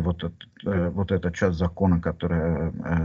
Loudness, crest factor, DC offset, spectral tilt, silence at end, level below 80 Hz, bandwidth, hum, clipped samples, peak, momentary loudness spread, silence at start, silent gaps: -26 LUFS; 16 dB; under 0.1%; -8.5 dB/octave; 0 s; -40 dBFS; 7.2 kHz; none; under 0.1%; -8 dBFS; 7 LU; 0 s; none